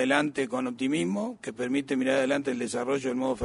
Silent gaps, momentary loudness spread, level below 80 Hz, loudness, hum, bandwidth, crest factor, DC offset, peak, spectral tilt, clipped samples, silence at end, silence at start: none; 5 LU; -68 dBFS; -28 LUFS; none; 11 kHz; 20 dB; under 0.1%; -8 dBFS; -4.5 dB/octave; under 0.1%; 0 s; 0 s